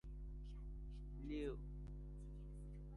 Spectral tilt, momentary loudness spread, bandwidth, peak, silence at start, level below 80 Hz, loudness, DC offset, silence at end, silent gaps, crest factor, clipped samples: -8 dB/octave; 8 LU; 10.5 kHz; -34 dBFS; 0.05 s; -52 dBFS; -53 LUFS; under 0.1%; 0 s; none; 16 dB; under 0.1%